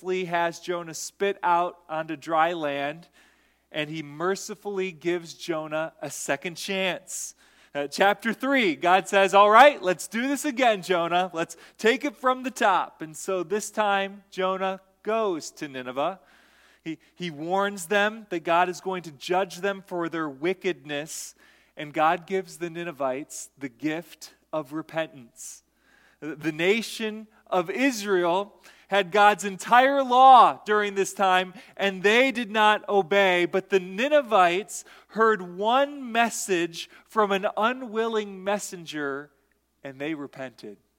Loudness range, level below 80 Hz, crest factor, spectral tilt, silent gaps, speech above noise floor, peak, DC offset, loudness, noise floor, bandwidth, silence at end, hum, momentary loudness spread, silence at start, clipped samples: 11 LU; -74 dBFS; 24 dB; -3.5 dB/octave; none; 44 dB; -2 dBFS; under 0.1%; -24 LUFS; -69 dBFS; 17 kHz; 0.25 s; none; 15 LU; 0 s; under 0.1%